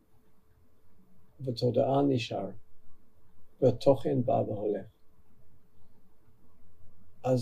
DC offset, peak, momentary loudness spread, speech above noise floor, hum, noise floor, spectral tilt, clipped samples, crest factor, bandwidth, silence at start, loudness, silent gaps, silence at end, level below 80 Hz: under 0.1%; -10 dBFS; 12 LU; 28 dB; none; -56 dBFS; -8 dB/octave; under 0.1%; 22 dB; 13 kHz; 0.1 s; -30 LUFS; none; 0 s; -62 dBFS